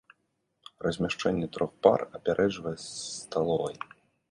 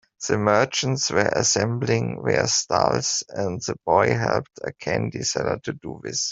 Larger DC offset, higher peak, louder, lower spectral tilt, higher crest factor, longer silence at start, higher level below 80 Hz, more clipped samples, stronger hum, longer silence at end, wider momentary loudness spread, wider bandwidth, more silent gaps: neither; about the same, -4 dBFS vs -2 dBFS; second, -29 LUFS vs -22 LUFS; first, -5 dB/octave vs -3.5 dB/octave; first, 26 dB vs 20 dB; first, 0.8 s vs 0.2 s; about the same, -60 dBFS vs -56 dBFS; neither; neither; first, 0.45 s vs 0 s; first, 12 LU vs 9 LU; first, 11.5 kHz vs 7.8 kHz; neither